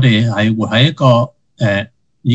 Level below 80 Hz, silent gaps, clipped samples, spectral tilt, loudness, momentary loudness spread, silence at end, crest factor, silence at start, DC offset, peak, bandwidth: -52 dBFS; none; under 0.1%; -7 dB/octave; -14 LUFS; 12 LU; 0 s; 14 dB; 0 s; under 0.1%; 0 dBFS; 8 kHz